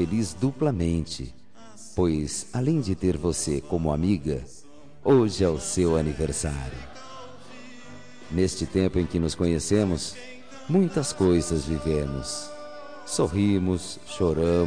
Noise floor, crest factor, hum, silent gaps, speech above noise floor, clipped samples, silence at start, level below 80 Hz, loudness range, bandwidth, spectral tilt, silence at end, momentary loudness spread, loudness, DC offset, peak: -48 dBFS; 16 dB; none; none; 24 dB; under 0.1%; 0 s; -42 dBFS; 4 LU; 10.5 kHz; -6 dB/octave; 0 s; 19 LU; -26 LUFS; 0.7%; -8 dBFS